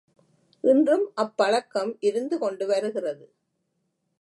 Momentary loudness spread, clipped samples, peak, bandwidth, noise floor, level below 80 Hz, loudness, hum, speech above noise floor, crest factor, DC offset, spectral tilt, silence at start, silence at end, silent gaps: 10 LU; under 0.1%; -8 dBFS; 11.5 kHz; -76 dBFS; -84 dBFS; -25 LUFS; none; 52 dB; 18 dB; under 0.1%; -4.5 dB/octave; 0.65 s; 1.05 s; none